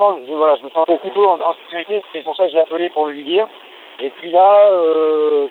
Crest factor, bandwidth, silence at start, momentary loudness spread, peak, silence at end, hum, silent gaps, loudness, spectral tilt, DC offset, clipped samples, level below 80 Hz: 14 dB; 4.2 kHz; 0 s; 15 LU; -2 dBFS; 0 s; none; none; -15 LUFS; -6 dB/octave; under 0.1%; under 0.1%; -76 dBFS